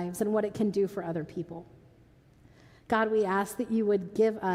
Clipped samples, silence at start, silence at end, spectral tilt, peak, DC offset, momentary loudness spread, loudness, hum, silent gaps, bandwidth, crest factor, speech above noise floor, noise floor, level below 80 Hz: under 0.1%; 0 s; 0 s; -6.5 dB/octave; -14 dBFS; under 0.1%; 12 LU; -29 LUFS; none; none; 16 kHz; 16 dB; 30 dB; -59 dBFS; -66 dBFS